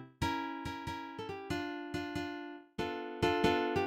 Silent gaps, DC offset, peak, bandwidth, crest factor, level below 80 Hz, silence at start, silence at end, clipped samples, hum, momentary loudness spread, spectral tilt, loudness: none; under 0.1%; -14 dBFS; 16.5 kHz; 22 dB; -56 dBFS; 0 s; 0 s; under 0.1%; none; 12 LU; -5.5 dB/octave; -37 LUFS